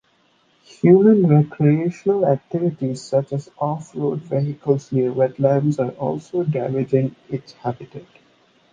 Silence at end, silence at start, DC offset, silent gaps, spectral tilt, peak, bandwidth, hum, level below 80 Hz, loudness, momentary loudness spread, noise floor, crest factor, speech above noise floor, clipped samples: 0.7 s; 0.85 s; under 0.1%; none; -9 dB/octave; -2 dBFS; 9.2 kHz; none; -62 dBFS; -20 LUFS; 14 LU; -60 dBFS; 18 dB; 42 dB; under 0.1%